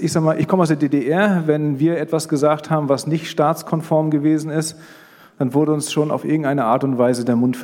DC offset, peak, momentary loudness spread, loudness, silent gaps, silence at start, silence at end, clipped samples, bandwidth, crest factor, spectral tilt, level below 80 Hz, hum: under 0.1%; -2 dBFS; 4 LU; -18 LUFS; none; 0 s; 0 s; under 0.1%; 17 kHz; 16 dB; -6.5 dB/octave; -66 dBFS; none